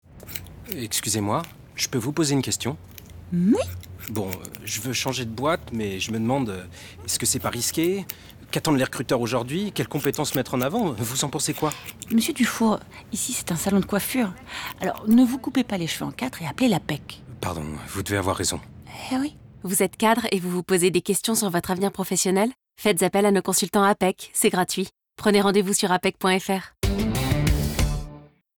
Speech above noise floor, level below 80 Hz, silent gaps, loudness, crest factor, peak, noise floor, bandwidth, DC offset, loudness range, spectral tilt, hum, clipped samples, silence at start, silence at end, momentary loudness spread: 21 dB; -40 dBFS; none; -24 LUFS; 16 dB; -8 dBFS; -45 dBFS; over 20 kHz; under 0.1%; 5 LU; -4 dB/octave; none; under 0.1%; 0.15 s; 0.35 s; 12 LU